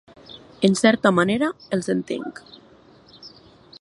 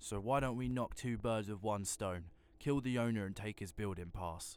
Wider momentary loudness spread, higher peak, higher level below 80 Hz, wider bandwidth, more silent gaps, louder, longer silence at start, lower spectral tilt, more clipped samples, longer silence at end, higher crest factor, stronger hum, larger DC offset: first, 26 LU vs 8 LU; first, -2 dBFS vs -22 dBFS; about the same, -60 dBFS vs -56 dBFS; second, 11.5 kHz vs 19 kHz; neither; first, -21 LUFS vs -40 LUFS; first, 0.3 s vs 0 s; about the same, -5 dB/octave vs -5.5 dB/octave; neither; first, 0.55 s vs 0 s; about the same, 22 dB vs 18 dB; neither; neither